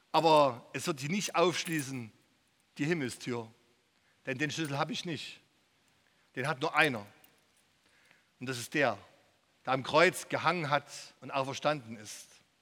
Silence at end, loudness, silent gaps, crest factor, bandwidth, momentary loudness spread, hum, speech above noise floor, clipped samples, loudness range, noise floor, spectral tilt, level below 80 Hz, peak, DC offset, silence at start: 0.4 s; -31 LUFS; none; 26 dB; 18 kHz; 19 LU; none; 39 dB; under 0.1%; 6 LU; -71 dBFS; -4 dB/octave; -78 dBFS; -8 dBFS; under 0.1%; 0.15 s